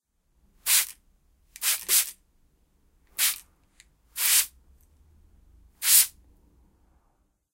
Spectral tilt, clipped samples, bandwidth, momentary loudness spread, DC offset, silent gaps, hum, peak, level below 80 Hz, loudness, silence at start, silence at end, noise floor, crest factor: 4 dB/octave; under 0.1%; 17 kHz; 15 LU; under 0.1%; none; none; -2 dBFS; -62 dBFS; -22 LUFS; 0.65 s; 1.45 s; -69 dBFS; 28 dB